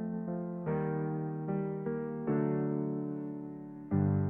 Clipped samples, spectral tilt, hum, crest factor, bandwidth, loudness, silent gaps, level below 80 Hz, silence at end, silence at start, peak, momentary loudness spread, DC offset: under 0.1%; -13 dB/octave; none; 16 dB; 2.9 kHz; -35 LUFS; none; -72 dBFS; 0 s; 0 s; -18 dBFS; 9 LU; under 0.1%